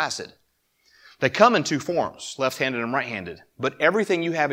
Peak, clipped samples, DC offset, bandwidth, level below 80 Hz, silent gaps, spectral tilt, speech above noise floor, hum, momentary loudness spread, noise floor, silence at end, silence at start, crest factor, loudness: 0 dBFS; under 0.1%; under 0.1%; 16.5 kHz; -64 dBFS; none; -4 dB/octave; 43 dB; none; 14 LU; -66 dBFS; 0 s; 0 s; 24 dB; -23 LUFS